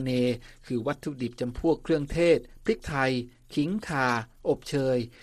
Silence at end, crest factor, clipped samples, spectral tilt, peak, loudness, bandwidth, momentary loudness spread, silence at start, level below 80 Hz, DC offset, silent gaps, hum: 0.15 s; 18 dB; under 0.1%; -6.5 dB/octave; -10 dBFS; -28 LUFS; 13.5 kHz; 9 LU; 0 s; -48 dBFS; under 0.1%; none; none